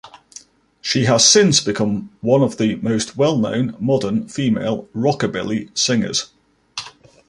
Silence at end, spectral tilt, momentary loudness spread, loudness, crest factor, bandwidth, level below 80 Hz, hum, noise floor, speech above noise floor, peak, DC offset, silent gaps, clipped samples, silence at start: 0.4 s; -4 dB/octave; 16 LU; -17 LUFS; 18 dB; 11.5 kHz; -54 dBFS; none; -44 dBFS; 27 dB; 0 dBFS; under 0.1%; none; under 0.1%; 0.05 s